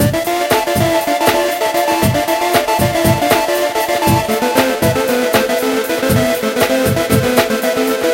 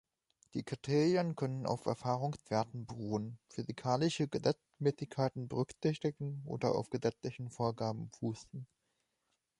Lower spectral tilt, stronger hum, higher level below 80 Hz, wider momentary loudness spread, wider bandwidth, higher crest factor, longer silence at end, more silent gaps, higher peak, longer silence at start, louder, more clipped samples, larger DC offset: second, -4.5 dB/octave vs -6.5 dB/octave; neither; first, -38 dBFS vs -70 dBFS; second, 2 LU vs 11 LU; first, 17 kHz vs 11.5 kHz; second, 14 dB vs 20 dB; second, 0 s vs 0.95 s; neither; first, 0 dBFS vs -16 dBFS; second, 0 s vs 0.55 s; first, -14 LUFS vs -37 LUFS; neither; neither